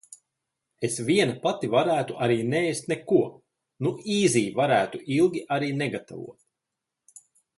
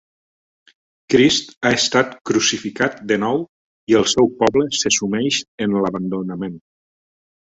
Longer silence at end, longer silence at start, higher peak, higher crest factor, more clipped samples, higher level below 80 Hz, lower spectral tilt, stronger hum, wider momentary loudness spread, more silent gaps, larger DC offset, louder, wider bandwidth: first, 1.25 s vs 1 s; second, 0.8 s vs 1.1 s; second, -8 dBFS vs -2 dBFS; about the same, 18 dB vs 18 dB; neither; second, -68 dBFS vs -54 dBFS; first, -5 dB/octave vs -3.5 dB/octave; neither; about the same, 9 LU vs 10 LU; second, none vs 1.57-1.61 s, 2.21-2.25 s, 3.49-3.87 s, 5.48-5.58 s; neither; second, -25 LUFS vs -18 LUFS; first, 11.5 kHz vs 8.4 kHz